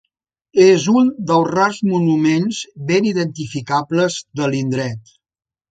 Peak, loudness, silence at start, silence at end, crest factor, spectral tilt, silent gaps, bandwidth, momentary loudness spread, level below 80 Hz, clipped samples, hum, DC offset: 0 dBFS; -17 LUFS; 0.55 s; 0.7 s; 16 dB; -6 dB/octave; none; 9.2 kHz; 11 LU; -60 dBFS; under 0.1%; none; under 0.1%